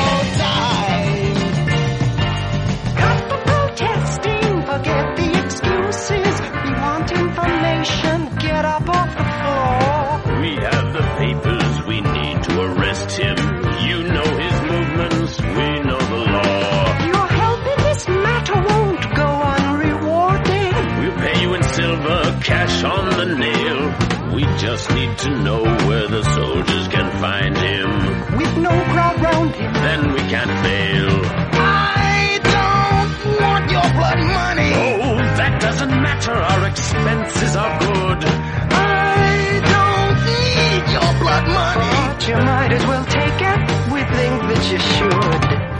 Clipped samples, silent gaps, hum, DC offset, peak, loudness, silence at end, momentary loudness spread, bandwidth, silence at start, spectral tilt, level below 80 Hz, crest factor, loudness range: under 0.1%; none; none; under 0.1%; -2 dBFS; -17 LUFS; 0 s; 4 LU; 10.5 kHz; 0 s; -5.5 dB/octave; -30 dBFS; 16 dB; 3 LU